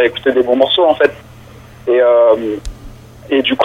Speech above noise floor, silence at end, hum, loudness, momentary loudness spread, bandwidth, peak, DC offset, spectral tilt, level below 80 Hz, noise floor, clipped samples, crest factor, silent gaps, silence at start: 25 dB; 0 s; none; -12 LUFS; 14 LU; 11 kHz; 0 dBFS; under 0.1%; -5 dB/octave; -38 dBFS; -37 dBFS; under 0.1%; 14 dB; none; 0 s